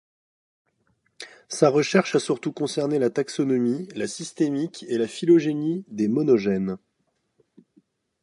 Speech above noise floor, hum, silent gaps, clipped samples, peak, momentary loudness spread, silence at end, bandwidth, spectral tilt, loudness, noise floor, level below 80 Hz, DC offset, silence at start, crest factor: 50 dB; none; none; under 0.1%; -4 dBFS; 12 LU; 1.45 s; 11.5 kHz; -5.5 dB/octave; -23 LUFS; -73 dBFS; -68 dBFS; under 0.1%; 1.2 s; 22 dB